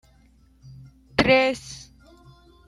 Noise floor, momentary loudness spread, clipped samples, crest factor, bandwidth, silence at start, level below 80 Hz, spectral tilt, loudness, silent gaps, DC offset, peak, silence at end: -56 dBFS; 22 LU; under 0.1%; 24 dB; 12 kHz; 1.2 s; -50 dBFS; -4.5 dB/octave; -21 LUFS; none; under 0.1%; -2 dBFS; 0.9 s